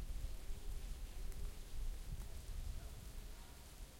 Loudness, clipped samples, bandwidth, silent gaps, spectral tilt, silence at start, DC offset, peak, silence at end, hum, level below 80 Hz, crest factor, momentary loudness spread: -53 LUFS; under 0.1%; 16.5 kHz; none; -4.5 dB/octave; 0 s; under 0.1%; -34 dBFS; 0 s; none; -48 dBFS; 12 dB; 5 LU